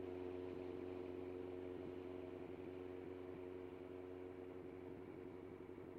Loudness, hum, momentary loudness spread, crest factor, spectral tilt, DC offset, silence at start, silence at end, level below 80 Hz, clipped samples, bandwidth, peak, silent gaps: -52 LUFS; none; 5 LU; 12 dB; -8.5 dB/octave; under 0.1%; 0 s; 0 s; -76 dBFS; under 0.1%; 6.8 kHz; -38 dBFS; none